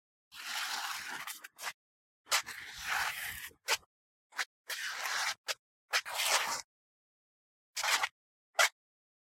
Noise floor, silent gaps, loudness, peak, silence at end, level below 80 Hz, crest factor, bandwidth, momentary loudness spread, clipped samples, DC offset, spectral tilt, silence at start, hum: under -90 dBFS; 1.74-2.24 s, 3.86-4.30 s, 4.46-4.64 s, 5.38-5.44 s, 5.59-5.88 s, 6.64-7.74 s, 8.12-8.53 s; -35 LUFS; -12 dBFS; 0.55 s; -74 dBFS; 26 dB; 16.5 kHz; 13 LU; under 0.1%; under 0.1%; 2 dB/octave; 0.3 s; none